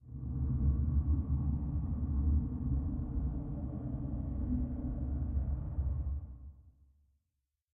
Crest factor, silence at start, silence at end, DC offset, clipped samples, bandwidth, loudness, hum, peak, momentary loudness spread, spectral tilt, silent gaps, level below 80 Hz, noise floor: 14 dB; 0.05 s; 1.05 s; under 0.1%; under 0.1%; 1.6 kHz; -36 LUFS; none; -22 dBFS; 8 LU; -14.5 dB/octave; none; -38 dBFS; -86 dBFS